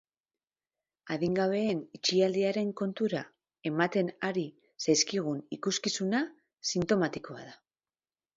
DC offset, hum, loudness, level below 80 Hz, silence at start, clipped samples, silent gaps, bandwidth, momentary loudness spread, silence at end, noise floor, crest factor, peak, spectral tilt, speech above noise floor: under 0.1%; none; -31 LUFS; -70 dBFS; 1.05 s; under 0.1%; none; 7.8 kHz; 13 LU; 0.8 s; under -90 dBFS; 18 dB; -12 dBFS; -4 dB/octave; over 60 dB